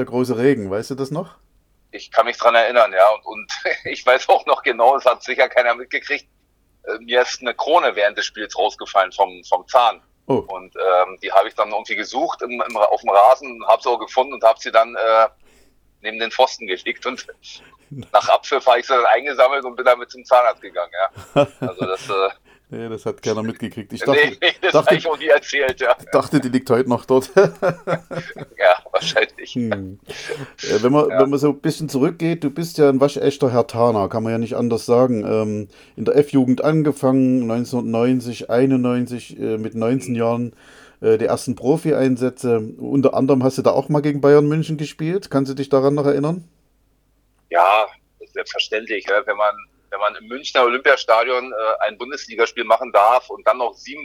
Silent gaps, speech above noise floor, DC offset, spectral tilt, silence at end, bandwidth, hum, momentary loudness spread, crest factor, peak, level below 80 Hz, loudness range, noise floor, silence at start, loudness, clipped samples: none; 43 dB; under 0.1%; -5.5 dB/octave; 0 s; 19.5 kHz; 50 Hz at -55 dBFS; 11 LU; 18 dB; 0 dBFS; -60 dBFS; 4 LU; -61 dBFS; 0 s; -18 LUFS; under 0.1%